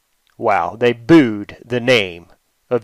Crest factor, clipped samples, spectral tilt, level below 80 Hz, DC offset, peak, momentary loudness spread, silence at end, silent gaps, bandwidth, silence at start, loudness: 16 dB; under 0.1%; -6 dB/octave; -52 dBFS; under 0.1%; -2 dBFS; 12 LU; 0.05 s; none; 11.5 kHz; 0.4 s; -16 LUFS